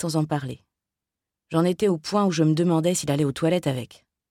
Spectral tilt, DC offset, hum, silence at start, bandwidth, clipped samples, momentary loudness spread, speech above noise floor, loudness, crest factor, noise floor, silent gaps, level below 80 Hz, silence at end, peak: -6 dB/octave; under 0.1%; none; 0 s; 14.5 kHz; under 0.1%; 11 LU; 65 dB; -23 LUFS; 16 dB; -87 dBFS; none; -62 dBFS; 0.45 s; -8 dBFS